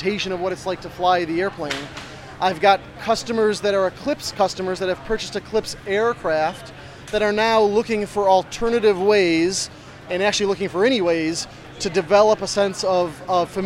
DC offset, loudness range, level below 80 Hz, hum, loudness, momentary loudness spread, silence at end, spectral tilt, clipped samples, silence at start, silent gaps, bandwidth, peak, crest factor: under 0.1%; 4 LU; -48 dBFS; none; -20 LUFS; 11 LU; 0 s; -4 dB/octave; under 0.1%; 0 s; none; 15.5 kHz; -2 dBFS; 18 dB